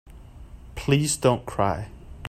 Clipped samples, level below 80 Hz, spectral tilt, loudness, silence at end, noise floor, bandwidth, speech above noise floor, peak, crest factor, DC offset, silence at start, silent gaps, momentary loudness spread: under 0.1%; -44 dBFS; -5 dB/octave; -24 LUFS; 0 s; -43 dBFS; 15.5 kHz; 20 dB; -6 dBFS; 20 dB; under 0.1%; 0.05 s; none; 16 LU